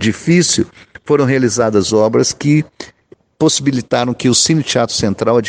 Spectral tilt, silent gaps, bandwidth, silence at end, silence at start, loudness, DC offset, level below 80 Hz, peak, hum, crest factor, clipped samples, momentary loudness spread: -4.5 dB/octave; none; 10 kHz; 0 s; 0 s; -14 LUFS; under 0.1%; -48 dBFS; 0 dBFS; none; 14 dB; under 0.1%; 7 LU